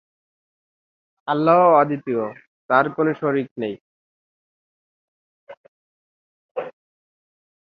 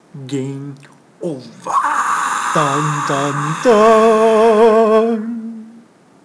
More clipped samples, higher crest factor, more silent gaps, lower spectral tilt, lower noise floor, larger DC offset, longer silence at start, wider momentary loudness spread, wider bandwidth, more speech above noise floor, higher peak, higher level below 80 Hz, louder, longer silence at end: neither; first, 20 dB vs 14 dB; first, 2.47-2.69 s, 3.51-3.56 s, 3.81-5.47 s, 5.57-6.55 s vs none; first, -9.5 dB/octave vs -5 dB/octave; first, under -90 dBFS vs -45 dBFS; neither; first, 1.25 s vs 0.15 s; about the same, 19 LU vs 18 LU; second, 5.2 kHz vs 11 kHz; first, over 71 dB vs 32 dB; about the same, -2 dBFS vs 0 dBFS; second, -72 dBFS vs -58 dBFS; second, -19 LUFS vs -13 LUFS; first, 1.05 s vs 0.55 s